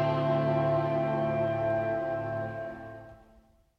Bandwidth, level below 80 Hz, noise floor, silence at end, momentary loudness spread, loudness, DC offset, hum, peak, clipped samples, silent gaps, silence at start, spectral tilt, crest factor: 6.2 kHz; -58 dBFS; -61 dBFS; 0.65 s; 14 LU; -29 LUFS; under 0.1%; none; -16 dBFS; under 0.1%; none; 0 s; -9 dB/octave; 14 dB